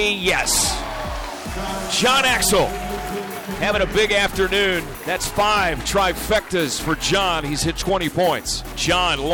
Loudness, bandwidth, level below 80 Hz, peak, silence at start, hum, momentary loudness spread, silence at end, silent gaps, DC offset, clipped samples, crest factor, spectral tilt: -20 LUFS; over 20 kHz; -34 dBFS; -8 dBFS; 0 s; none; 11 LU; 0 s; none; under 0.1%; under 0.1%; 12 dB; -2.5 dB/octave